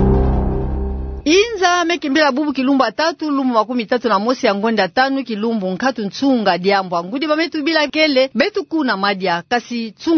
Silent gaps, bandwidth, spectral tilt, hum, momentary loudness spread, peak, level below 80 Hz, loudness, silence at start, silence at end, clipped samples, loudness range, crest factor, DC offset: none; 6.6 kHz; -5 dB/octave; none; 6 LU; -2 dBFS; -28 dBFS; -17 LUFS; 0 s; 0 s; under 0.1%; 1 LU; 16 dB; under 0.1%